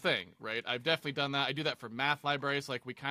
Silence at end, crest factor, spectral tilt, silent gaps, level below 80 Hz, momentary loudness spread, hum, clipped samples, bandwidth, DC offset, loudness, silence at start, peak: 0 s; 20 dB; -4.5 dB/octave; none; -76 dBFS; 6 LU; none; under 0.1%; 15.5 kHz; under 0.1%; -34 LUFS; 0 s; -14 dBFS